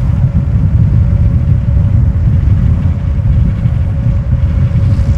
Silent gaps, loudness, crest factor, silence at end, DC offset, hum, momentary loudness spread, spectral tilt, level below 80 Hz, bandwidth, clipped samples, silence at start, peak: none; -12 LUFS; 10 dB; 0 s; under 0.1%; none; 3 LU; -10 dB/octave; -14 dBFS; 5.2 kHz; under 0.1%; 0 s; 0 dBFS